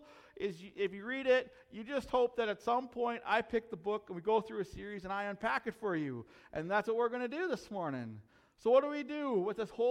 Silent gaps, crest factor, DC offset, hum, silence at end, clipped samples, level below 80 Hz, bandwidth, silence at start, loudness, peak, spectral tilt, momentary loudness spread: none; 20 dB; under 0.1%; none; 0 s; under 0.1%; -66 dBFS; 11 kHz; 0 s; -36 LUFS; -16 dBFS; -6 dB/octave; 11 LU